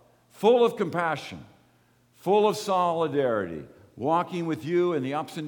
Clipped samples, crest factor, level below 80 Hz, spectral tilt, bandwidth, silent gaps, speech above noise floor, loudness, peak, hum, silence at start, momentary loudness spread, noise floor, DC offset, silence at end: under 0.1%; 18 dB; -68 dBFS; -6 dB/octave; 19 kHz; none; 38 dB; -26 LUFS; -8 dBFS; none; 0.4 s; 13 LU; -63 dBFS; under 0.1%; 0 s